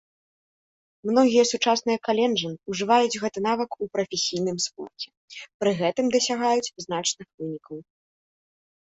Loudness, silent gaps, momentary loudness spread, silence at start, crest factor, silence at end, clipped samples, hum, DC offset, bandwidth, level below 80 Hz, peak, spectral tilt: -24 LUFS; 5.17-5.28 s, 5.54-5.60 s, 7.34-7.38 s; 16 LU; 1.05 s; 18 dB; 1 s; under 0.1%; none; under 0.1%; 8.4 kHz; -68 dBFS; -6 dBFS; -3.5 dB/octave